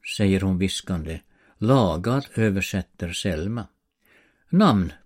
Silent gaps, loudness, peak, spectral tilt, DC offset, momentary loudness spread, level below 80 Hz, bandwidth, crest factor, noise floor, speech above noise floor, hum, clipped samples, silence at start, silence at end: none; -23 LUFS; -6 dBFS; -6 dB/octave; under 0.1%; 11 LU; -44 dBFS; 16 kHz; 18 dB; -61 dBFS; 39 dB; none; under 0.1%; 0.05 s; 0.1 s